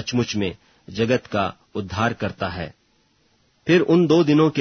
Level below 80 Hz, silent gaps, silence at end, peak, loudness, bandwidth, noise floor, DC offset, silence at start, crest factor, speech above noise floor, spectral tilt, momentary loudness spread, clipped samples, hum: -52 dBFS; none; 0 s; -4 dBFS; -21 LUFS; 6.6 kHz; -62 dBFS; under 0.1%; 0 s; 18 dB; 43 dB; -6.5 dB/octave; 16 LU; under 0.1%; none